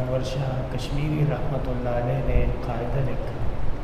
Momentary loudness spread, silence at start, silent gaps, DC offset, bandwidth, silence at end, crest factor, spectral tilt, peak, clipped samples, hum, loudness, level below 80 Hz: 6 LU; 0 s; none; under 0.1%; 12.5 kHz; 0 s; 16 dB; -7.5 dB/octave; -8 dBFS; under 0.1%; none; -27 LUFS; -30 dBFS